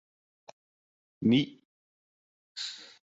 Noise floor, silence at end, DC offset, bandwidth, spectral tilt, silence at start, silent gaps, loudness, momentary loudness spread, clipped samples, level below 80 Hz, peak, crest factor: under -90 dBFS; 0.25 s; under 0.1%; 8 kHz; -5.5 dB/octave; 1.2 s; 1.65-2.55 s; -30 LUFS; 12 LU; under 0.1%; -70 dBFS; -14 dBFS; 22 dB